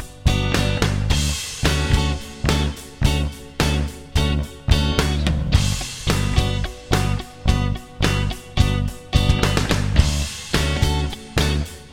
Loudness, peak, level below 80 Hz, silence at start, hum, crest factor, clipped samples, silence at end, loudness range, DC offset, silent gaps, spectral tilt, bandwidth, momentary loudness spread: -21 LUFS; -2 dBFS; -24 dBFS; 0 s; none; 18 dB; under 0.1%; 0 s; 1 LU; 0.2%; none; -5 dB/octave; 16.5 kHz; 6 LU